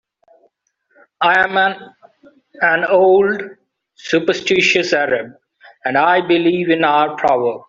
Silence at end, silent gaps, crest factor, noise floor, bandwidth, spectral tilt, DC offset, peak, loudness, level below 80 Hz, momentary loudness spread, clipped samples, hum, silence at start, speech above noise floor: 0.1 s; none; 16 dB; -63 dBFS; 7.6 kHz; -4.5 dB/octave; under 0.1%; 0 dBFS; -15 LUFS; -60 dBFS; 11 LU; under 0.1%; none; 1.2 s; 49 dB